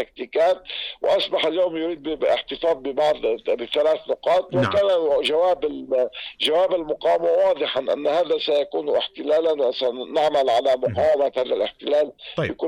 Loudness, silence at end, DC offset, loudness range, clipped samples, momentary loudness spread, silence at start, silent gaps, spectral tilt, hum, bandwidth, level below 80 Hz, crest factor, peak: -22 LUFS; 0 s; under 0.1%; 2 LU; under 0.1%; 6 LU; 0 s; none; -5 dB/octave; none; 11.5 kHz; -56 dBFS; 10 dB; -12 dBFS